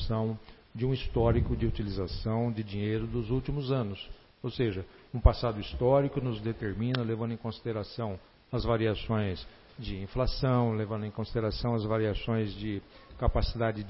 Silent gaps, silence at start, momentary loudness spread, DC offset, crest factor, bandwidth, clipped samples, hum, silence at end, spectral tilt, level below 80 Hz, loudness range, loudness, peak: none; 0 s; 12 LU; under 0.1%; 26 dB; 5.8 kHz; under 0.1%; none; 0 s; -11 dB/octave; -38 dBFS; 3 LU; -31 LUFS; -6 dBFS